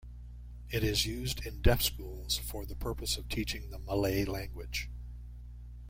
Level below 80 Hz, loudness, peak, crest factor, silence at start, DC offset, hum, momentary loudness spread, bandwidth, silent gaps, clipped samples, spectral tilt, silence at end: -40 dBFS; -34 LUFS; -10 dBFS; 24 dB; 0 s; under 0.1%; 60 Hz at -40 dBFS; 19 LU; 16.5 kHz; none; under 0.1%; -4 dB/octave; 0 s